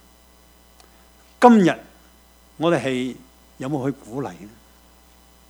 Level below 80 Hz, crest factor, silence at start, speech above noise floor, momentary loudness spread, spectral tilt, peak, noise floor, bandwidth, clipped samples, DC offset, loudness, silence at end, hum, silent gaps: -56 dBFS; 24 dB; 1.4 s; 33 dB; 20 LU; -6.5 dB/octave; 0 dBFS; -52 dBFS; over 20 kHz; under 0.1%; under 0.1%; -20 LUFS; 1.05 s; 60 Hz at -55 dBFS; none